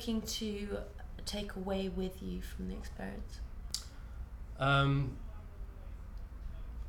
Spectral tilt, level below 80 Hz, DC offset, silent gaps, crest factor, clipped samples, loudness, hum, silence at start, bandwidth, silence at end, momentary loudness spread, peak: -5.5 dB/octave; -46 dBFS; under 0.1%; none; 24 dB; under 0.1%; -37 LUFS; none; 0 s; 18 kHz; 0 s; 18 LU; -14 dBFS